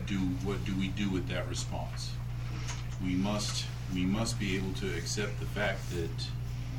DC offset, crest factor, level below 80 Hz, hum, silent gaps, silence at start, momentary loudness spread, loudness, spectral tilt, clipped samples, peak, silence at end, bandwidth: under 0.1%; 14 dB; -42 dBFS; 60 Hz at -40 dBFS; none; 0 s; 6 LU; -34 LUFS; -5 dB/octave; under 0.1%; -20 dBFS; 0 s; 16.5 kHz